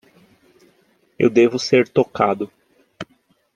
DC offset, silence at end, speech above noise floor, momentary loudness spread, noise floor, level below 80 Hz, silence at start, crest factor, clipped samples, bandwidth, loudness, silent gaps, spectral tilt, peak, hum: under 0.1%; 0.5 s; 45 dB; 22 LU; -61 dBFS; -62 dBFS; 1.2 s; 18 dB; under 0.1%; 9 kHz; -18 LUFS; none; -5.5 dB/octave; -2 dBFS; none